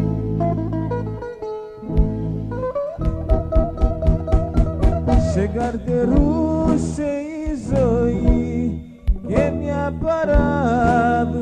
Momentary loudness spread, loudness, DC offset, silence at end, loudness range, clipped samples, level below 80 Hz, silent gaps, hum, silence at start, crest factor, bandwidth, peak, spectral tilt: 8 LU; -20 LUFS; under 0.1%; 0 s; 4 LU; under 0.1%; -24 dBFS; none; none; 0 s; 16 dB; 9.4 kHz; -2 dBFS; -8.5 dB/octave